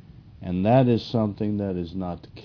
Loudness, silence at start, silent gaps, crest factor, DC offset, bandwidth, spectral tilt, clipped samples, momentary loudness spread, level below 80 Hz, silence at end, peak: -24 LUFS; 0.25 s; none; 18 dB; under 0.1%; 5.4 kHz; -9.5 dB/octave; under 0.1%; 13 LU; -52 dBFS; 0 s; -6 dBFS